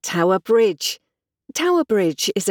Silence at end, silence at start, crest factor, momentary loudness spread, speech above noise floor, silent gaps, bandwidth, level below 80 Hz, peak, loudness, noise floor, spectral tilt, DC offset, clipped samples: 0 s; 0.05 s; 14 dB; 9 LU; 28 dB; none; over 20 kHz; -68 dBFS; -6 dBFS; -19 LUFS; -47 dBFS; -4 dB/octave; under 0.1%; under 0.1%